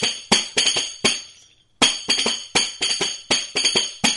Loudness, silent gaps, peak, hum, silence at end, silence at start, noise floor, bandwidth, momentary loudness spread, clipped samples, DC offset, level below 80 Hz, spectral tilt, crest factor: -19 LUFS; none; 0 dBFS; none; 0 s; 0 s; -53 dBFS; 11.5 kHz; 3 LU; under 0.1%; under 0.1%; -56 dBFS; -0.5 dB/octave; 22 dB